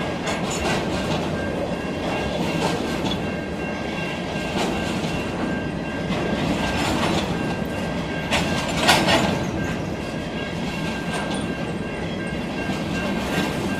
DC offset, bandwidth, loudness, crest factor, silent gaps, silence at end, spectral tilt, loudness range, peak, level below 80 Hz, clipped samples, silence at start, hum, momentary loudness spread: under 0.1%; 16 kHz; -24 LUFS; 22 dB; none; 0 s; -4.5 dB/octave; 5 LU; -2 dBFS; -40 dBFS; under 0.1%; 0 s; none; 6 LU